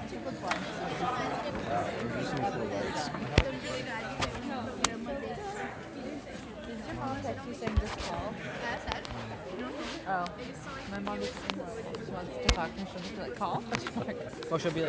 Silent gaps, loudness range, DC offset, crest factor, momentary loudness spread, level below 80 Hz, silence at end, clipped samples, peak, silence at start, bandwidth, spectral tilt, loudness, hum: none; 4 LU; under 0.1%; 32 dB; 9 LU; -44 dBFS; 0 s; under 0.1%; -4 dBFS; 0 s; 8 kHz; -4.5 dB/octave; -35 LUFS; none